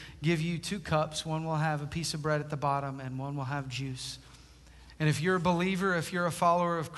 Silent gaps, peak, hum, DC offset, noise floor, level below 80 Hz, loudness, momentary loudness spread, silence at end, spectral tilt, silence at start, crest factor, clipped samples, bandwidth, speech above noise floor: none; -14 dBFS; none; under 0.1%; -54 dBFS; -56 dBFS; -31 LUFS; 9 LU; 0 s; -5.5 dB/octave; 0 s; 18 dB; under 0.1%; 12.5 kHz; 23 dB